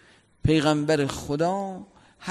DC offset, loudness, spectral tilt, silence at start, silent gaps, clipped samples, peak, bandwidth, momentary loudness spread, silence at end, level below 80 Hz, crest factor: under 0.1%; -25 LUFS; -6 dB/octave; 0.45 s; none; under 0.1%; -10 dBFS; 13 kHz; 15 LU; 0 s; -44 dBFS; 16 dB